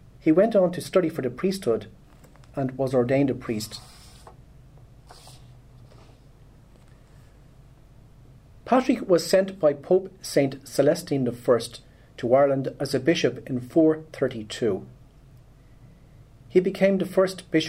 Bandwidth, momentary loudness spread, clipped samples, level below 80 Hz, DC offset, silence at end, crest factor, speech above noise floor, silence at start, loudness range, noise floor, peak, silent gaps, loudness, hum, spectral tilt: 16 kHz; 10 LU; under 0.1%; -54 dBFS; under 0.1%; 0 s; 20 dB; 28 dB; 0.25 s; 6 LU; -51 dBFS; -6 dBFS; none; -24 LUFS; none; -6 dB/octave